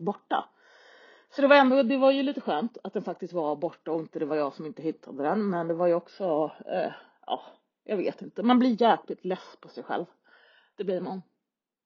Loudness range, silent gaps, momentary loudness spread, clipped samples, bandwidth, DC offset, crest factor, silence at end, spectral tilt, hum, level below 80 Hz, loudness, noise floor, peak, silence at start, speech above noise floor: 6 LU; none; 14 LU; under 0.1%; 6.6 kHz; under 0.1%; 24 dB; 0.65 s; -4 dB/octave; none; -82 dBFS; -27 LUFS; -86 dBFS; -4 dBFS; 0 s; 59 dB